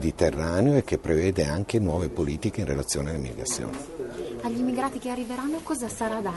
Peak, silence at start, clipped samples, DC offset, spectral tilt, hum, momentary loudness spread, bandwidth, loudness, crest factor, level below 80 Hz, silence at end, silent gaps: -8 dBFS; 0 s; under 0.1%; under 0.1%; -5.5 dB/octave; none; 9 LU; 11.5 kHz; -27 LUFS; 20 dB; -42 dBFS; 0 s; none